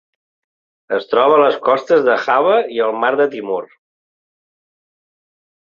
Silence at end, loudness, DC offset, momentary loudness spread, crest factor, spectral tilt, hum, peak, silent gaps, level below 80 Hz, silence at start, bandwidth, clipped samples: 2 s; -15 LUFS; under 0.1%; 11 LU; 16 dB; -5.5 dB/octave; none; 0 dBFS; none; -66 dBFS; 0.9 s; 7 kHz; under 0.1%